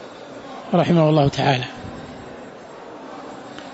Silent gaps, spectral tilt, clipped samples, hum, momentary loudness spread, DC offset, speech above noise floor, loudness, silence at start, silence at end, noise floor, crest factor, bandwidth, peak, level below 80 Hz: none; -7 dB/octave; under 0.1%; none; 22 LU; under 0.1%; 21 dB; -18 LUFS; 0 s; 0 s; -38 dBFS; 18 dB; 8 kHz; -4 dBFS; -52 dBFS